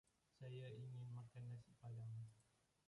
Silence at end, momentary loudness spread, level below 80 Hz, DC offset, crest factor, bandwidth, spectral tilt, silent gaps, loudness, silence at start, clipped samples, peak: 0.45 s; 4 LU; -82 dBFS; under 0.1%; 10 dB; 11 kHz; -7.5 dB/octave; none; -57 LUFS; 0.35 s; under 0.1%; -46 dBFS